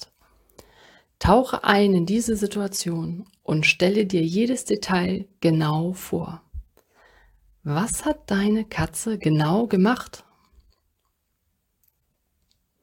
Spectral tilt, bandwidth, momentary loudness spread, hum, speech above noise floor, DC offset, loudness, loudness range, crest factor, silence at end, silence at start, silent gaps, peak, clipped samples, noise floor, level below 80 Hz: -5.5 dB/octave; 17 kHz; 13 LU; none; 51 dB; under 0.1%; -22 LUFS; 5 LU; 22 dB; 2.65 s; 0 s; none; -2 dBFS; under 0.1%; -73 dBFS; -44 dBFS